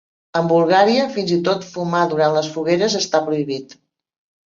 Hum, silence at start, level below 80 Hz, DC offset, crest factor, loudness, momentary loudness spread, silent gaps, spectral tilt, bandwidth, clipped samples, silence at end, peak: none; 0.35 s; -64 dBFS; under 0.1%; 16 dB; -18 LUFS; 9 LU; none; -5 dB/octave; 7.6 kHz; under 0.1%; 0.85 s; -2 dBFS